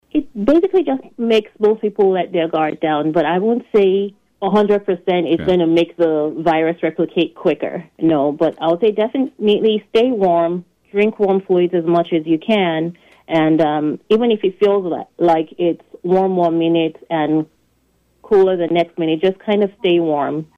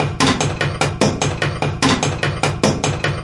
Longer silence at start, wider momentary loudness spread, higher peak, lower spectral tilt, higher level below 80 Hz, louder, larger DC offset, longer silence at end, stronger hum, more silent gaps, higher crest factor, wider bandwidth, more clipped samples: first, 0.15 s vs 0 s; first, 6 LU vs 3 LU; second, -6 dBFS vs -2 dBFS; first, -8 dB/octave vs -4.5 dB/octave; second, -54 dBFS vs -36 dBFS; about the same, -17 LUFS vs -18 LUFS; neither; first, 0.15 s vs 0 s; neither; neither; second, 10 dB vs 16 dB; second, 6.8 kHz vs 11.5 kHz; neither